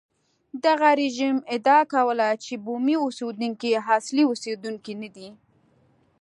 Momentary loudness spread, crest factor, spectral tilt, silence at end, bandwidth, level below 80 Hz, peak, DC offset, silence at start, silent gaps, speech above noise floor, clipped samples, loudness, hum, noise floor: 15 LU; 20 dB; -4 dB/octave; 0.9 s; 11 kHz; -78 dBFS; -4 dBFS; under 0.1%; 0.55 s; none; 39 dB; under 0.1%; -23 LUFS; none; -62 dBFS